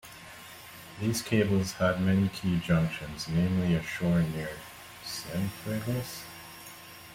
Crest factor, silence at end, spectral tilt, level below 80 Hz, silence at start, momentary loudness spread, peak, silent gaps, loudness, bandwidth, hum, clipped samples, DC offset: 18 dB; 0 s; -6 dB/octave; -54 dBFS; 0.05 s; 18 LU; -12 dBFS; none; -30 LUFS; 16.5 kHz; none; under 0.1%; under 0.1%